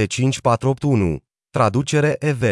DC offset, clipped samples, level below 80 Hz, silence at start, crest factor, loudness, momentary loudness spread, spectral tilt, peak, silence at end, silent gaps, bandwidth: under 0.1%; under 0.1%; -46 dBFS; 0 s; 14 dB; -19 LUFS; 5 LU; -6 dB/octave; -4 dBFS; 0 s; none; 12 kHz